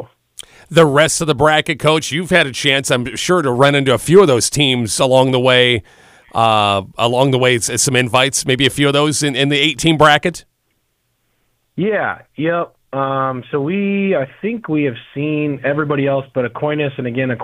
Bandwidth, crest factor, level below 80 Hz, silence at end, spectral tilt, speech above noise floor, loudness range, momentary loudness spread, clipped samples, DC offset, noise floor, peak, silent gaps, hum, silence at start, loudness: 16 kHz; 16 dB; -48 dBFS; 0 s; -4 dB/octave; 51 dB; 6 LU; 10 LU; under 0.1%; under 0.1%; -66 dBFS; 0 dBFS; none; none; 0 s; -15 LUFS